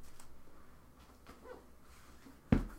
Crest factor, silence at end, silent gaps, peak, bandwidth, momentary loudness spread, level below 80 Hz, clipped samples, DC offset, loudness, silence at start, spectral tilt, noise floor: 30 dB; 0 s; none; -12 dBFS; 16 kHz; 24 LU; -50 dBFS; under 0.1%; under 0.1%; -40 LUFS; 0 s; -7.5 dB/octave; -59 dBFS